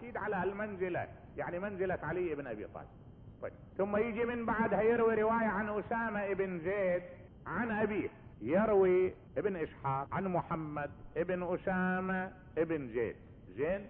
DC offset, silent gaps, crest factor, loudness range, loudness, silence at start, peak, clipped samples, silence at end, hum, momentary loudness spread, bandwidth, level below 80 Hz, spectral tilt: under 0.1%; none; 16 dB; 5 LU; -35 LUFS; 0 s; -20 dBFS; under 0.1%; 0 s; none; 14 LU; 3.9 kHz; -58 dBFS; -6.5 dB/octave